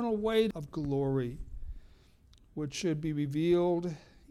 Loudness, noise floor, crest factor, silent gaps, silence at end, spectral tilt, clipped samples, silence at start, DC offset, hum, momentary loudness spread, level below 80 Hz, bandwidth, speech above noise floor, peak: -32 LUFS; -60 dBFS; 18 dB; none; 0.3 s; -6.5 dB/octave; under 0.1%; 0 s; under 0.1%; none; 19 LU; -50 dBFS; 13 kHz; 29 dB; -16 dBFS